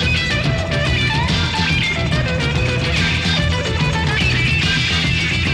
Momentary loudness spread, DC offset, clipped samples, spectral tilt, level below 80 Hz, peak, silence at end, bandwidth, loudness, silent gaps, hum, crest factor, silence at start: 3 LU; 0.4%; under 0.1%; -4.5 dB/octave; -28 dBFS; -4 dBFS; 0 s; 12 kHz; -16 LUFS; none; none; 12 dB; 0 s